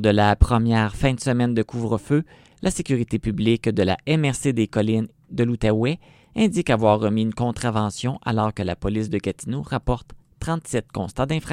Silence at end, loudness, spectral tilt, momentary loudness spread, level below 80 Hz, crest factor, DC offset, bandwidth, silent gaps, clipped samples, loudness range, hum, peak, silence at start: 0 s; -22 LUFS; -6.5 dB/octave; 9 LU; -34 dBFS; 20 dB; under 0.1%; 13.5 kHz; none; under 0.1%; 4 LU; none; 0 dBFS; 0 s